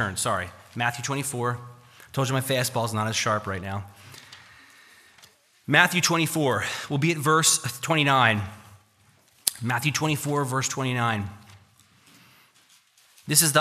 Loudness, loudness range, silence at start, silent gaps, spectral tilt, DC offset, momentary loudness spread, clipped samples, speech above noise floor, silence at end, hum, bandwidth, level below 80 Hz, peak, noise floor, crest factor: -24 LUFS; 6 LU; 0 s; none; -3 dB/octave; under 0.1%; 17 LU; under 0.1%; 36 dB; 0 s; none; 15.5 kHz; -64 dBFS; 0 dBFS; -60 dBFS; 26 dB